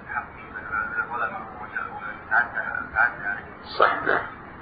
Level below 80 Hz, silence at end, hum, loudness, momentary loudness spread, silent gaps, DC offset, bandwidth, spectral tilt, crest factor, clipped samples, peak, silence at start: -54 dBFS; 0 s; none; -26 LUFS; 14 LU; none; under 0.1%; 5 kHz; -8 dB/octave; 22 dB; under 0.1%; -4 dBFS; 0 s